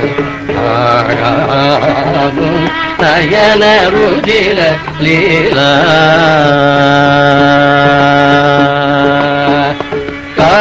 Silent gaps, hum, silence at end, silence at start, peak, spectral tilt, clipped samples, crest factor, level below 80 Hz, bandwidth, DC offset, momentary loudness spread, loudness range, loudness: none; none; 0 s; 0 s; 0 dBFS; -6 dB/octave; 0.5%; 8 dB; -34 dBFS; 8 kHz; under 0.1%; 6 LU; 2 LU; -8 LUFS